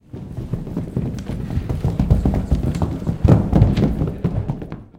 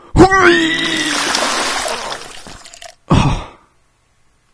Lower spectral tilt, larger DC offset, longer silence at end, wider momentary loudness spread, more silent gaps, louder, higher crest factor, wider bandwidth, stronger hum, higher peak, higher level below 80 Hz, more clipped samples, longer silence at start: first, -9 dB/octave vs -4 dB/octave; neither; second, 0.15 s vs 1.05 s; second, 12 LU vs 24 LU; neither; second, -20 LUFS vs -13 LUFS; about the same, 20 dB vs 16 dB; about the same, 10.5 kHz vs 11 kHz; neither; about the same, 0 dBFS vs 0 dBFS; about the same, -26 dBFS vs -30 dBFS; second, under 0.1% vs 0.4%; about the same, 0.15 s vs 0.15 s